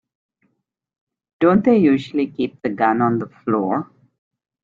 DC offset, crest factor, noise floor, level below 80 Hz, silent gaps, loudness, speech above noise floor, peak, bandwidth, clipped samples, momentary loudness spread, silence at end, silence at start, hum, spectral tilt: under 0.1%; 16 dB; -72 dBFS; -58 dBFS; none; -19 LUFS; 55 dB; -4 dBFS; 7.4 kHz; under 0.1%; 10 LU; 0.8 s; 1.4 s; none; -9 dB/octave